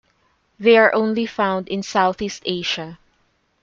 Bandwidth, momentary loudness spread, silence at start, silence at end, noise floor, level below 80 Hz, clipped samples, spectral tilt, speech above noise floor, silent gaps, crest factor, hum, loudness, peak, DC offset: 7.6 kHz; 12 LU; 0.6 s; 0.65 s; -64 dBFS; -58 dBFS; under 0.1%; -4.5 dB/octave; 46 dB; none; 18 dB; none; -19 LUFS; -2 dBFS; under 0.1%